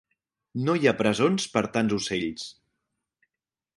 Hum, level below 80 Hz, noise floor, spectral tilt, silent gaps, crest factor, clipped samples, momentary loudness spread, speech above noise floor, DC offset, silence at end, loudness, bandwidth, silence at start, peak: none; -60 dBFS; -88 dBFS; -5 dB/octave; none; 22 dB; under 0.1%; 14 LU; 63 dB; under 0.1%; 1.25 s; -25 LUFS; 11.5 kHz; 0.55 s; -6 dBFS